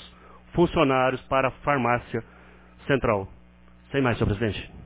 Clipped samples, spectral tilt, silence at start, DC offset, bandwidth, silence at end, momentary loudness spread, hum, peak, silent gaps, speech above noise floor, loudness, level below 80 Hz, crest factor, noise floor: under 0.1%; -10.5 dB/octave; 0 s; under 0.1%; 4 kHz; 0 s; 11 LU; 60 Hz at -50 dBFS; -6 dBFS; none; 28 dB; -25 LUFS; -44 dBFS; 20 dB; -52 dBFS